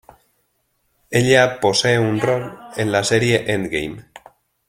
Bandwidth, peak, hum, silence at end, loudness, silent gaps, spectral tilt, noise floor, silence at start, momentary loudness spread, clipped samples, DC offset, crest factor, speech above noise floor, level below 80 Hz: 16 kHz; 0 dBFS; none; 0.65 s; -18 LUFS; none; -4.5 dB/octave; -67 dBFS; 1.1 s; 11 LU; under 0.1%; under 0.1%; 18 dB; 50 dB; -52 dBFS